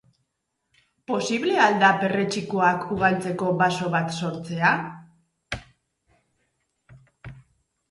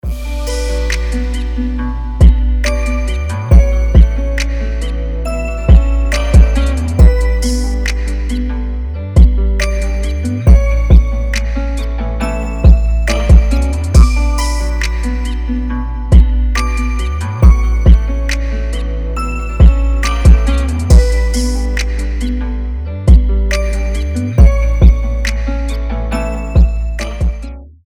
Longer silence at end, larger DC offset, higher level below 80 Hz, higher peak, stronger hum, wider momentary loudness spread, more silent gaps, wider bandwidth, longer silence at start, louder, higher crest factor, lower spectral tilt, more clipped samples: first, 0.5 s vs 0.15 s; neither; second, -58 dBFS vs -12 dBFS; second, -4 dBFS vs 0 dBFS; neither; first, 14 LU vs 9 LU; neither; about the same, 11.5 kHz vs 11 kHz; first, 1.1 s vs 0.05 s; second, -22 LUFS vs -14 LUFS; first, 20 dB vs 10 dB; second, -5 dB/octave vs -6.5 dB/octave; second, under 0.1% vs 0.9%